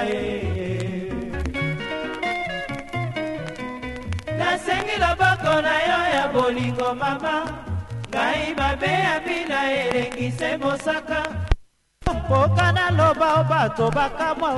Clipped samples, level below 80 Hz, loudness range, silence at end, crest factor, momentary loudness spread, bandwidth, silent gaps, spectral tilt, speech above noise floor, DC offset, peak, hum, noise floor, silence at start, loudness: under 0.1%; -36 dBFS; 6 LU; 0 s; 22 dB; 11 LU; 11.5 kHz; none; -5.5 dB/octave; 25 dB; under 0.1%; -2 dBFS; none; -46 dBFS; 0 s; -23 LUFS